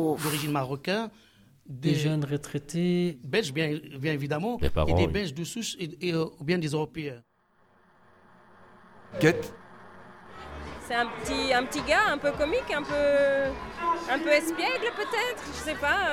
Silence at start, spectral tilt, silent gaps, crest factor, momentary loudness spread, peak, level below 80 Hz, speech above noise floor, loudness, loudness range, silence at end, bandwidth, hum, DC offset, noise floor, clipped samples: 0 s; -5 dB/octave; none; 22 dB; 10 LU; -8 dBFS; -46 dBFS; 38 dB; -28 LUFS; 7 LU; 0 s; 17.5 kHz; none; under 0.1%; -65 dBFS; under 0.1%